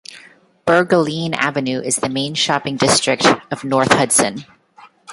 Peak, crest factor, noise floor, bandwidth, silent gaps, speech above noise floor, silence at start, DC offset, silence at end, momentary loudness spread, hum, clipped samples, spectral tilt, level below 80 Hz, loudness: 0 dBFS; 18 dB; -47 dBFS; 12 kHz; none; 30 dB; 0.1 s; under 0.1%; 0 s; 8 LU; none; under 0.1%; -3 dB/octave; -54 dBFS; -16 LUFS